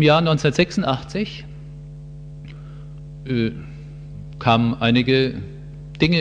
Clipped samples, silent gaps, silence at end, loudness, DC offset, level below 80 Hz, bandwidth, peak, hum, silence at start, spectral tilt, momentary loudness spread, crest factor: under 0.1%; none; 0 s; -20 LUFS; under 0.1%; -42 dBFS; 9.4 kHz; -2 dBFS; none; 0 s; -6.5 dB/octave; 21 LU; 18 dB